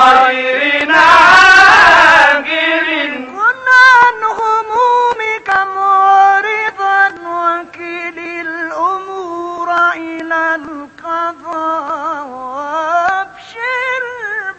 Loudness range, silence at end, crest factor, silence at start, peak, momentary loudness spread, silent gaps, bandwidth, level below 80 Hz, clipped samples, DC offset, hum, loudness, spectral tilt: 11 LU; 0.05 s; 12 dB; 0 s; 0 dBFS; 17 LU; none; 11 kHz; -48 dBFS; 0.5%; under 0.1%; none; -10 LUFS; -2 dB/octave